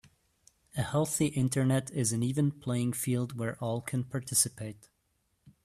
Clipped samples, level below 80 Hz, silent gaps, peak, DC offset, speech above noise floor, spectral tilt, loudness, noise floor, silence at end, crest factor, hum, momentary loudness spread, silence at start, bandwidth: under 0.1%; -62 dBFS; none; -12 dBFS; under 0.1%; 45 dB; -5 dB/octave; -31 LUFS; -76 dBFS; 0.15 s; 20 dB; none; 8 LU; 0.75 s; 15.5 kHz